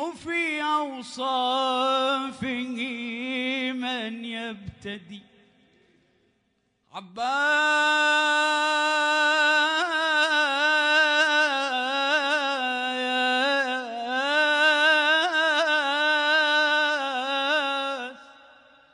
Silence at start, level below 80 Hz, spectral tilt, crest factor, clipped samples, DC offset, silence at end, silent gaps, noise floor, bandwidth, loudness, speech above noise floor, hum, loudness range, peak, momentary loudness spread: 0 s; -68 dBFS; -1.5 dB/octave; 16 dB; under 0.1%; under 0.1%; 0.6 s; none; -72 dBFS; 10.5 kHz; -23 LUFS; 47 dB; none; 11 LU; -8 dBFS; 12 LU